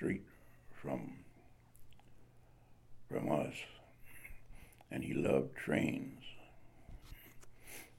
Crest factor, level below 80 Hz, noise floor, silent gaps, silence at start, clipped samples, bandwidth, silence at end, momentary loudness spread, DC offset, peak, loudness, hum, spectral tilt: 24 dB; -62 dBFS; -62 dBFS; none; 0 s; under 0.1%; 16.5 kHz; 0 s; 24 LU; under 0.1%; -18 dBFS; -40 LUFS; none; -6.5 dB/octave